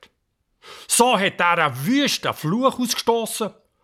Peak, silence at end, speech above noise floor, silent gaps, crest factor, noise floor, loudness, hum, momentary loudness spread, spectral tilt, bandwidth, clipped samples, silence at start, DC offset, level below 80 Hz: -4 dBFS; 0.35 s; 51 dB; none; 18 dB; -71 dBFS; -20 LUFS; none; 7 LU; -3 dB/octave; 17.5 kHz; under 0.1%; 0.65 s; under 0.1%; -64 dBFS